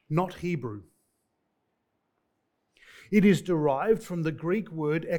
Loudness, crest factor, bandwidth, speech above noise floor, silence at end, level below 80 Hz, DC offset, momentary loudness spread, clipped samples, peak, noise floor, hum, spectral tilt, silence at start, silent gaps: -27 LUFS; 20 dB; 18 kHz; 51 dB; 0 s; -60 dBFS; under 0.1%; 11 LU; under 0.1%; -10 dBFS; -78 dBFS; none; -7.5 dB/octave; 0.1 s; none